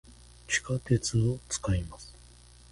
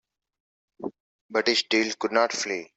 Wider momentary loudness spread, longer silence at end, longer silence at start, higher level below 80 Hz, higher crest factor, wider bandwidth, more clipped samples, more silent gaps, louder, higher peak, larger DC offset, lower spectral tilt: about the same, 17 LU vs 16 LU; first, 0.55 s vs 0.15 s; second, 0.1 s vs 0.8 s; first, -46 dBFS vs -74 dBFS; about the same, 20 dB vs 22 dB; first, 11.5 kHz vs 8.2 kHz; neither; second, none vs 1.00-1.29 s; second, -30 LUFS vs -24 LUFS; second, -12 dBFS vs -6 dBFS; neither; first, -4.5 dB/octave vs -2 dB/octave